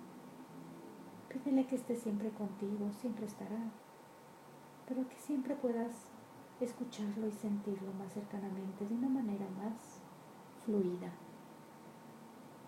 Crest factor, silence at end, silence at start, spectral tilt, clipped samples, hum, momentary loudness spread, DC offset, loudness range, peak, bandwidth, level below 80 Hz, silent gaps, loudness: 18 dB; 0 s; 0 s; -7 dB/octave; under 0.1%; none; 19 LU; under 0.1%; 3 LU; -22 dBFS; 16 kHz; -84 dBFS; none; -40 LUFS